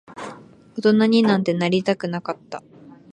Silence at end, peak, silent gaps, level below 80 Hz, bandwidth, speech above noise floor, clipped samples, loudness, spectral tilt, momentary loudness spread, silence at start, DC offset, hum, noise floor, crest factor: 0.2 s; -4 dBFS; none; -64 dBFS; 9.6 kHz; 22 dB; under 0.1%; -20 LUFS; -6.5 dB/octave; 20 LU; 0.1 s; under 0.1%; none; -41 dBFS; 18 dB